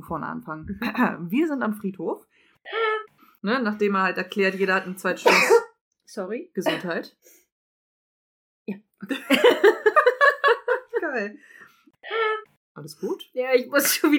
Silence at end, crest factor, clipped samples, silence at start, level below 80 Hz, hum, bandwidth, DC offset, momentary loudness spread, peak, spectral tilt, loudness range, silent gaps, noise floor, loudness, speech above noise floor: 0 s; 20 dB; under 0.1%; 0.05 s; -62 dBFS; none; 19 kHz; under 0.1%; 17 LU; -4 dBFS; -3.5 dB/octave; 7 LU; 5.81-5.91 s, 7.52-8.66 s, 12.57-12.75 s; -51 dBFS; -22 LUFS; 27 dB